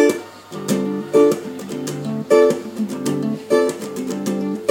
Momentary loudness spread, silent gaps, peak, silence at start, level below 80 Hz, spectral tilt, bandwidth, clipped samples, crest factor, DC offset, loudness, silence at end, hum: 12 LU; none; -2 dBFS; 0 s; -66 dBFS; -5.5 dB/octave; 17 kHz; under 0.1%; 18 dB; under 0.1%; -20 LUFS; 0 s; none